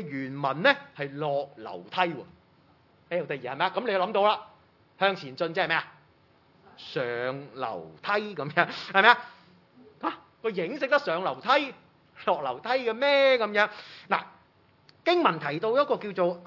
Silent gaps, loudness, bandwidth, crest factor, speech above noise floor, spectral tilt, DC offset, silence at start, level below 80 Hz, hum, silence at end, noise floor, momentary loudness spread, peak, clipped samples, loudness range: none; -27 LUFS; 6 kHz; 26 dB; 35 dB; -5.5 dB/octave; under 0.1%; 0 s; -80 dBFS; none; 0 s; -62 dBFS; 13 LU; -2 dBFS; under 0.1%; 5 LU